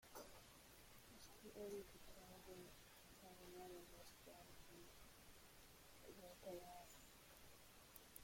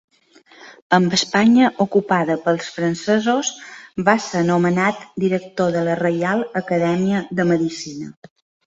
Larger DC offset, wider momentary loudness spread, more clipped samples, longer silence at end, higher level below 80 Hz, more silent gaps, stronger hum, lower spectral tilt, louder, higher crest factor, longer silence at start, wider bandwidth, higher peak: neither; about the same, 8 LU vs 9 LU; neither; second, 0 s vs 0.55 s; second, -74 dBFS vs -60 dBFS; second, none vs 0.82-0.90 s; neither; second, -3.5 dB/octave vs -5 dB/octave; second, -61 LUFS vs -18 LUFS; first, 24 dB vs 18 dB; second, 0 s vs 0.6 s; first, 16.5 kHz vs 8 kHz; second, -38 dBFS vs -2 dBFS